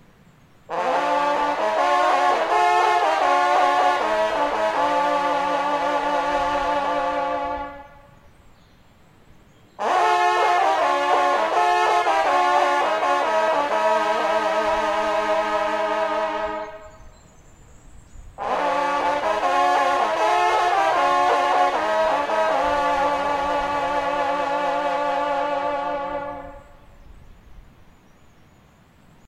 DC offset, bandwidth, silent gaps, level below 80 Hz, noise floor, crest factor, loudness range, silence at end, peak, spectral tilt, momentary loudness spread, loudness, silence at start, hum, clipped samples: under 0.1%; 14.5 kHz; none; -50 dBFS; -53 dBFS; 16 dB; 8 LU; 1.65 s; -6 dBFS; -3 dB/octave; 7 LU; -21 LUFS; 0.7 s; none; under 0.1%